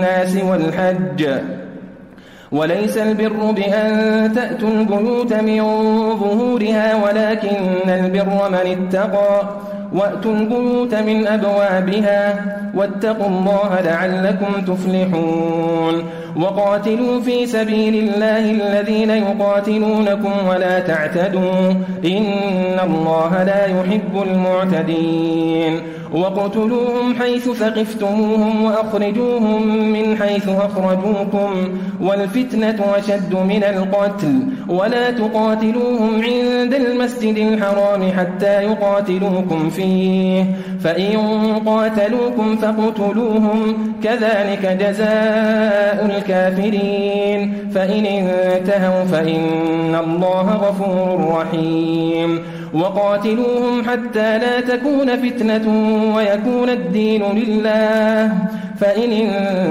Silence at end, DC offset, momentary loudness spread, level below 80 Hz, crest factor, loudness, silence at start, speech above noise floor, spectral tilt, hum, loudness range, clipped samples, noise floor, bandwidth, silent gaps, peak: 0 s; under 0.1%; 3 LU; -54 dBFS; 10 dB; -17 LUFS; 0 s; 24 dB; -7 dB/octave; none; 2 LU; under 0.1%; -40 dBFS; 14.5 kHz; none; -6 dBFS